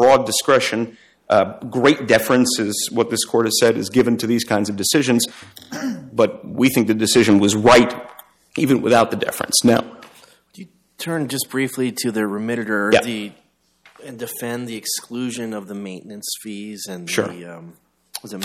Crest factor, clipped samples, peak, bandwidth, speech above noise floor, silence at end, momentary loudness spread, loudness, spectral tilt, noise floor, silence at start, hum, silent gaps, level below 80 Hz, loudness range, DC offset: 16 dB; under 0.1%; -2 dBFS; 16 kHz; 36 dB; 0 s; 17 LU; -18 LUFS; -4 dB/octave; -55 dBFS; 0 s; none; none; -54 dBFS; 11 LU; under 0.1%